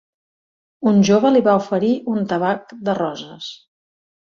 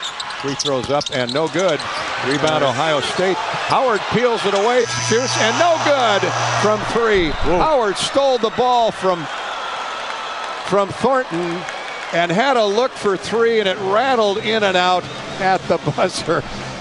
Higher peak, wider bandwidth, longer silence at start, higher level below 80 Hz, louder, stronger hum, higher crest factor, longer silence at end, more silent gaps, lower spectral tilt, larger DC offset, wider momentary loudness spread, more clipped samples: about the same, -2 dBFS vs 0 dBFS; second, 7.2 kHz vs 11.5 kHz; first, 0.8 s vs 0 s; second, -62 dBFS vs -40 dBFS; about the same, -18 LUFS vs -18 LUFS; neither; about the same, 16 dB vs 18 dB; first, 0.8 s vs 0 s; neither; first, -6.5 dB/octave vs -3.5 dB/octave; neither; first, 17 LU vs 9 LU; neither